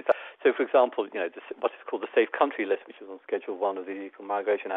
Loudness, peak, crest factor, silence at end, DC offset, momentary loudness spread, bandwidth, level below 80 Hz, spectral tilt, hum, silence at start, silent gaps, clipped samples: -28 LUFS; -8 dBFS; 20 dB; 0 s; under 0.1%; 12 LU; 4 kHz; -80 dBFS; -6.5 dB/octave; none; 0.05 s; none; under 0.1%